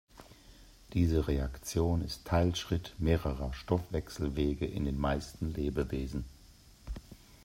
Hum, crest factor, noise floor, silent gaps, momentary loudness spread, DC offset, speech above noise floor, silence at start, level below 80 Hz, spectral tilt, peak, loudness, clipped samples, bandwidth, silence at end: none; 20 dB; -57 dBFS; none; 12 LU; under 0.1%; 25 dB; 0.15 s; -42 dBFS; -6.5 dB/octave; -14 dBFS; -34 LUFS; under 0.1%; 16 kHz; 0.1 s